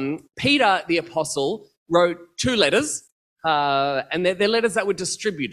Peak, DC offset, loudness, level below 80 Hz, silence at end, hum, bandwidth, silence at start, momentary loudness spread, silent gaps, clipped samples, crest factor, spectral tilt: -2 dBFS; under 0.1%; -21 LUFS; -54 dBFS; 0 s; none; 14 kHz; 0 s; 9 LU; 1.77-1.86 s, 3.12-3.36 s; under 0.1%; 20 dB; -3.5 dB/octave